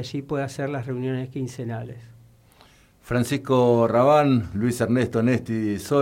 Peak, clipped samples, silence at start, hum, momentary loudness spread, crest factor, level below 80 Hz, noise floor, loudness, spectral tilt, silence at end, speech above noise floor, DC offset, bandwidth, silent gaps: -8 dBFS; under 0.1%; 0 s; none; 13 LU; 16 dB; -54 dBFS; -54 dBFS; -23 LUFS; -7 dB/octave; 0 s; 32 dB; under 0.1%; 16.5 kHz; none